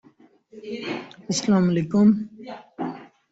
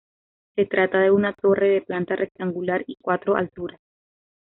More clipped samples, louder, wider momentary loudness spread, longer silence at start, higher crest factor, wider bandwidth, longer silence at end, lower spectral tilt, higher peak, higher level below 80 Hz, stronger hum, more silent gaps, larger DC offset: neither; about the same, -23 LUFS vs -22 LUFS; first, 21 LU vs 11 LU; about the same, 0.55 s vs 0.55 s; about the same, 16 dB vs 16 dB; first, 8 kHz vs 4.1 kHz; second, 0.25 s vs 0.7 s; about the same, -6 dB/octave vs -5 dB/octave; about the same, -8 dBFS vs -6 dBFS; about the same, -62 dBFS vs -62 dBFS; neither; neither; neither